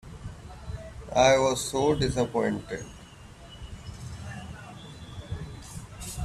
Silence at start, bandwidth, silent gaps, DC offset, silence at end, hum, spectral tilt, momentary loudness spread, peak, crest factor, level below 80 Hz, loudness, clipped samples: 0.05 s; 14 kHz; none; under 0.1%; 0 s; none; -4.5 dB/octave; 22 LU; -8 dBFS; 22 dB; -46 dBFS; -26 LUFS; under 0.1%